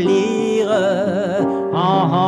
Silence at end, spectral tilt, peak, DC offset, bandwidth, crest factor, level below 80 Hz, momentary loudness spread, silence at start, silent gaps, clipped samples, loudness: 0 s; -6.5 dB/octave; -4 dBFS; under 0.1%; 11 kHz; 12 dB; -62 dBFS; 3 LU; 0 s; none; under 0.1%; -17 LUFS